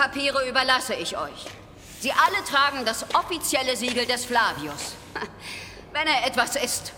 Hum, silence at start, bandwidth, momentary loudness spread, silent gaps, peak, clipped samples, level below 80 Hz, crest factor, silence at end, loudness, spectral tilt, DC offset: none; 0 s; 19.5 kHz; 14 LU; none; -4 dBFS; under 0.1%; -54 dBFS; 22 dB; 0 s; -24 LUFS; -1.5 dB/octave; under 0.1%